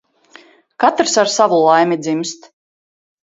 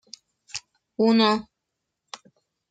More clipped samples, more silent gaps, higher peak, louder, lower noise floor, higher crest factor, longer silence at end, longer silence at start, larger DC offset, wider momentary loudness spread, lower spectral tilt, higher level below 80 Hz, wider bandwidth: neither; neither; first, 0 dBFS vs -8 dBFS; first, -14 LUFS vs -21 LUFS; second, -46 dBFS vs -82 dBFS; about the same, 16 dB vs 18 dB; second, 0.9 s vs 1.3 s; first, 0.8 s vs 0.55 s; neither; second, 11 LU vs 24 LU; about the same, -3.5 dB/octave vs -4.5 dB/octave; about the same, -66 dBFS vs -68 dBFS; second, 7.8 kHz vs 9.2 kHz